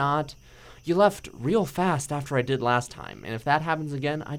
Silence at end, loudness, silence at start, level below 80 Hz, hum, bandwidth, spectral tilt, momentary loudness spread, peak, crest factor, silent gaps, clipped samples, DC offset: 0 s; -26 LUFS; 0 s; -54 dBFS; none; 18.5 kHz; -5.5 dB/octave; 14 LU; -6 dBFS; 20 dB; none; under 0.1%; under 0.1%